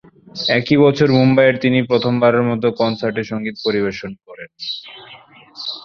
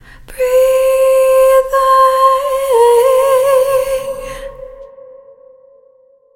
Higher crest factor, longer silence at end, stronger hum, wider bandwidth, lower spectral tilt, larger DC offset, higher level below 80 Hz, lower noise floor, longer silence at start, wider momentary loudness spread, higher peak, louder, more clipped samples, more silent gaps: about the same, 16 dB vs 12 dB; second, 0 s vs 1.5 s; neither; second, 6.8 kHz vs 16.5 kHz; first, -7 dB/octave vs -1.5 dB/octave; neither; second, -56 dBFS vs -40 dBFS; second, -43 dBFS vs -49 dBFS; about the same, 0.35 s vs 0.3 s; first, 20 LU vs 15 LU; about the same, 0 dBFS vs 0 dBFS; second, -16 LUFS vs -11 LUFS; neither; neither